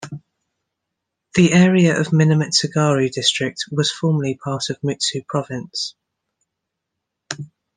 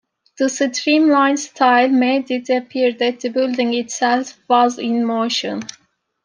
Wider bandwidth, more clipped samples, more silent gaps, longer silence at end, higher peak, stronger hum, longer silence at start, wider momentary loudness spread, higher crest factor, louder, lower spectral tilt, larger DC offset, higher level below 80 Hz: about the same, 10 kHz vs 10 kHz; neither; neither; second, 0.3 s vs 0.6 s; about the same, -2 dBFS vs -2 dBFS; neither; second, 0 s vs 0.4 s; first, 16 LU vs 8 LU; about the same, 18 dB vs 16 dB; about the same, -18 LUFS vs -17 LUFS; first, -5 dB/octave vs -3 dB/octave; neither; first, -60 dBFS vs -72 dBFS